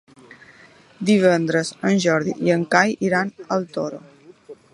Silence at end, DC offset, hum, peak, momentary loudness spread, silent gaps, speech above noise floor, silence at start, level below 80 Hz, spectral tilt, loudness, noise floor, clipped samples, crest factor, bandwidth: 0.2 s; under 0.1%; none; 0 dBFS; 11 LU; none; 30 dB; 1 s; -66 dBFS; -5.5 dB/octave; -20 LUFS; -49 dBFS; under 0.1%; 20 dB; 11 kHz